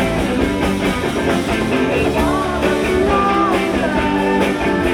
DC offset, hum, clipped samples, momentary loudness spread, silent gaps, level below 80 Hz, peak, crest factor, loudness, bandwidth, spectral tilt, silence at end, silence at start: under 0.1%; none; under 0.1%; 3 LU; none; -30 dBFS; -4 dBFS; 12 dB; -16 LUFS; 18.5 kHz; -5.5 dB/octave; 0 s; 0 s